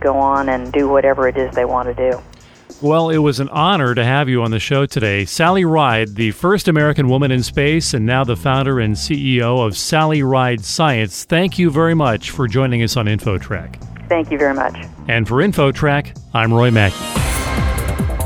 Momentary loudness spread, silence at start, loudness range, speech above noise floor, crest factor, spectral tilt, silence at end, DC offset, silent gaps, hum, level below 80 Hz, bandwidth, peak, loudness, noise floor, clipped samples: 6 LU; 0 s; 3 LU; 25 dB; 14 dB; -5.5 dB/octave; 0 s; under 0.1%; none; none; -32 dBFS; 18 kHz; 0 dBFS; -16 LUFS; -40 dBFS; under 0.1%